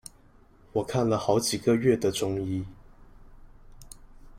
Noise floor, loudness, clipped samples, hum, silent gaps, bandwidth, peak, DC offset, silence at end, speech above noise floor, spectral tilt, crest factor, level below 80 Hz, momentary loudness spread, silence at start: -56 dBFS; -27 LUFS; under 0.1%; none; none; 16 kHz; -8 dBFS; under 0.1%; 0 s; 31 dB; -5 dB/octave; 20 dB; -52 dBFS; 11 LU; 0.75 s